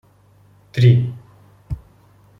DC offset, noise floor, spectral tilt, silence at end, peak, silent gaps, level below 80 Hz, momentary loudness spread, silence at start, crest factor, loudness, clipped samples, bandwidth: under 0.1%; -52 dBFS; -8.5 dB/octave; 0.6 s; -2 dBFS; none; -44 dBFS; 19 LU; 0.75 s; 18 dB; -17 LUFS; under 0.1%; 6 kHz